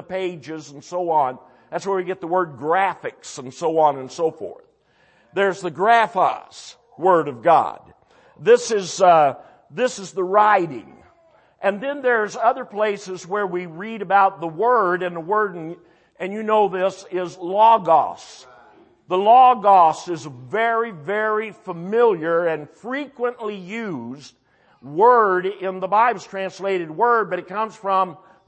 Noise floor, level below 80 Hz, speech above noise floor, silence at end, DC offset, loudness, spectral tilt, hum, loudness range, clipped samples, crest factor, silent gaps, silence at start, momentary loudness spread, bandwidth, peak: -59 dBFS; -72 dBFS; 39 dB; 0.3 s; under 0.1%; -20 LUFS; -4.5 dB/octave; none; 6 LU; under 0.1%; 18 dB; none; 0.1 s; 16 LU; 8.8 kHz; -4 dBFS